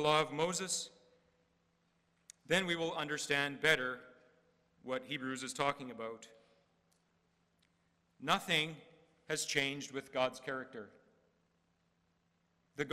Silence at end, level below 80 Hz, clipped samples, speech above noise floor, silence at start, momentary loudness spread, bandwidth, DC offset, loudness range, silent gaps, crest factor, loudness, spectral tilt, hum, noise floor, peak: 0 s; -76 dBFS; under 0.1%; 41 dB; 0 s; 17 LU; 16 kHz; under 0.1%; 7 LU; none; 24 dB; -36 LUFS; -2.5 dB/octave; none; -77 dBFS; -16 dBFS